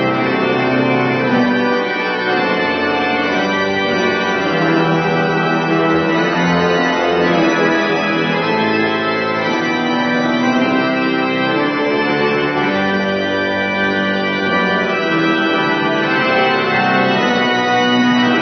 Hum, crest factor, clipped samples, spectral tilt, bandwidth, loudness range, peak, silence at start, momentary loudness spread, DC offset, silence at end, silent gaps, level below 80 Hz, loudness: none; 12 dB; under 0.1%; -5.5 dB/octave; 6.2 kHz; 1 LU; -2 dBFS; 0 s; 3 LU; under 0.1%; 0 s; none; -56 dBFS; -15 LUFS